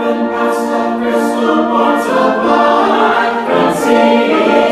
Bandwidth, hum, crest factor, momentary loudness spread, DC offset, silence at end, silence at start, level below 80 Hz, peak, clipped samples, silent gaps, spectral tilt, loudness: 15 kHz; none; 12 dB; 5 LU; under 0.1%; 0 s; 0 s; -52 dBFS; 0 dBFS; under 0.1%; none; -5 dB/octave; -12 LUFS